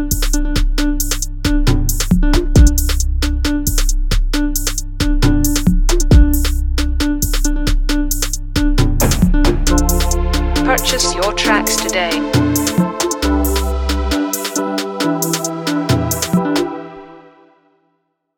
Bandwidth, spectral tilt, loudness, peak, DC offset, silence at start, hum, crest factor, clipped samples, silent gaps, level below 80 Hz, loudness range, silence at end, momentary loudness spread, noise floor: 18 kHz; -4.5 dB/octave; -16 LUFS; 0 dBFS; under 0.1%; 0 s; none; 14 dB; under 0.1%; none; -16 dBFS; 3 LU; 1.15 s; 6 LU; -66 dBFS